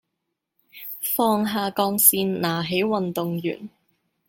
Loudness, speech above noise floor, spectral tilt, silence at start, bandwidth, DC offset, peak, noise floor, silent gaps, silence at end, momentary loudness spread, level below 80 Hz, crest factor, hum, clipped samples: -21 LUFS; 58 dB; -4 dB/octave; 0.75 s; 17 kHz; under 0.1%; 0 dBFS; -80 dBFS; none; 0.6 s; 15 LU; -66 dBFS; 24 dB; none; under 0.1%